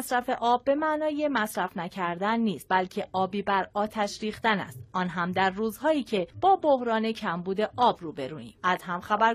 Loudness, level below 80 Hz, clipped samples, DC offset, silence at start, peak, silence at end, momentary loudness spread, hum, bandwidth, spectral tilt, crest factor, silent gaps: -27 LUFS; -62 dBFS; under 0.1%; under 0.1%; 0 s; -8 dBFS; 0 s; 7 LU; none; 15.5 kHz; -5 dB/octave; 18 dB; none